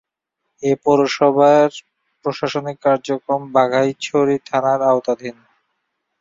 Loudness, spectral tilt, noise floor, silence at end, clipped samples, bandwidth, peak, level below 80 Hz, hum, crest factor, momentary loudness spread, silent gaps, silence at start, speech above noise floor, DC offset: -17 LUFS; -5.5 dB/octave; -77 dBFS; 0.9 s; under 0.1%; 7.8 kHz; -2 dBFS; -64 dBFS; none; 16 dB; 12 LU; none; 0.6 s; 60 dB; under 0.1%